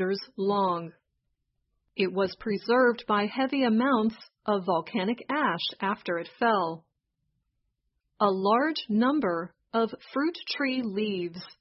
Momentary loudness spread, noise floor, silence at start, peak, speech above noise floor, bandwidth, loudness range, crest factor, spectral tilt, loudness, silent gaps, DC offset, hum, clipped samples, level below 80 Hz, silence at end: 9 LU; -79 dBFS; 0 s; -10 dBFS; 52 dB; 5.8 kHz; 3 LU; 20 dB; -9 dB/octave; -28 LUFS; none; under 0.1%; none; under 0.1%; -70 dBFS; 0.1 s